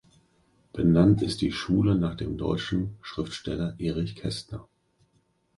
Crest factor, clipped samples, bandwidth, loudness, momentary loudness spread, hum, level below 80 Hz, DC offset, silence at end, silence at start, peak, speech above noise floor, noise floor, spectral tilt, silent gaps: 20 dB; under 0.1%; 11.5 kHz; -27 LUFS; 14 LU; none; -46 dBFS; under 0.1%; 0.95 s; 0.75 s; -8 dBFS; 43 dB; -69 dBFS; -7 dB/octave; none